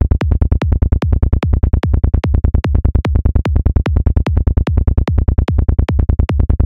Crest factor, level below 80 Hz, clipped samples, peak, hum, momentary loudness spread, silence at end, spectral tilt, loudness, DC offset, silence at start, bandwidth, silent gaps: 10 dB; -14 dBFS; under 0.1%; -2 dBFS; none; 0 LU; 0 s; -9 dB/octave; -15 LUFS; 2%; 0 s; 5.4 kHz; none